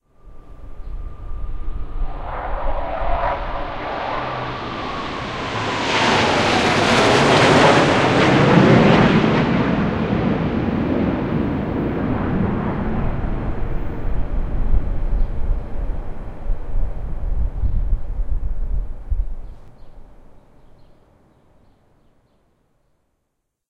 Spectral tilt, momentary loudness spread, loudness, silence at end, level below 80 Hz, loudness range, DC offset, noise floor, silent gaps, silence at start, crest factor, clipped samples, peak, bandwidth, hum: -5.5 dB/octave; 18 LU; -19 LUFS; 2.85 s; -26 dBFS; 15 LU; under 0.1%; -74 dBFS; none; 0.25 s; 18 dB; under 0.1%; 0 dBFS; 11 kHz; none